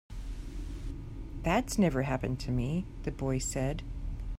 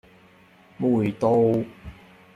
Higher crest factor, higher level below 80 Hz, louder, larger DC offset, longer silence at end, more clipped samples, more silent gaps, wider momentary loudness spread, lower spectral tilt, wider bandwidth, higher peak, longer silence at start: about the same, 18 dB vs 16 dB; first, -40 dBFS vs -56 dBFS; second, -33 LUFS vs -22 LUFS; neither; second, 0 s vs 0.45 s; neither; neither; second, 15 LU vs 22 LU; second, -6 dB/octave vs -9 dB/octave; first, 16 kHz vs 10 kHz; second, -16 dBFS vs -8 dBFS; second, 0.1 s vs 0.8 s